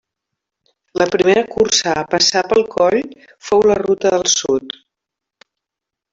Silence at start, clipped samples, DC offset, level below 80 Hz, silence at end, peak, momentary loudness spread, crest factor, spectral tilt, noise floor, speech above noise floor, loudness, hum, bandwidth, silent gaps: 0.95 s; under 0.1%; under 0.1%; -52 dBFS; 1.4 s; 0 dBFS; 14 LU; 16 dB; -2.5 dB/octave; -84 dBFS; 69 dB; -15 LUFS; none; 7.8 kHz; none